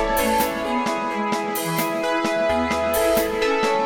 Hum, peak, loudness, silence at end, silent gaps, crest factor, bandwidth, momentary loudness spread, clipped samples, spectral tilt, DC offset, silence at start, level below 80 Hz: none; -6 dBFS; -21 LUFS; 0 s; none; 14 dB; 18 kHz; 4 LU; under 0.1%; -3.5 dB/octave; under 0.1%; 0 s; -42 dBFS